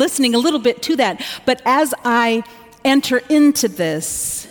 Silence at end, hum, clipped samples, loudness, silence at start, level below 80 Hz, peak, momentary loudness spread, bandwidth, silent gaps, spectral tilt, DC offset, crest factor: 0 s; none; under 0.1%; -16 LUFS; 0 s; -54 dBFS; -4 dBFS; 8 LU; 18 kHz; none; -3 dB/octave; under 0.1%; 12 dB